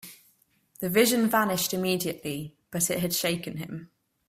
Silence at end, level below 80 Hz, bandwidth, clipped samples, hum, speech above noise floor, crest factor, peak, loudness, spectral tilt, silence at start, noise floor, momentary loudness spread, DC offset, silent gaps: 0.45 s; -64 dBFS; 16 kHz; under 0.1%; none; 39 dB; 20 dB; -8 dBFS; -26 LUFS; -3.5 dB/octave; 0.05 s; -66 dBFS; 15 LU; under 0.1%; none